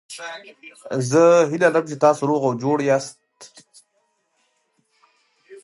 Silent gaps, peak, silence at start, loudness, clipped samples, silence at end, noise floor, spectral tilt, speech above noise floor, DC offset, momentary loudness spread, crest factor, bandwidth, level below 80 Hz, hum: none; -2 dBFS; 0.1 s; -18 LUFS; under 0.1%; 0.05 s; -69 dBFS; -5.5 dB/octave; 50 dB; under 0.1%; 20 LU; 18 dB; 11.5 kHz; -74 dBFS; none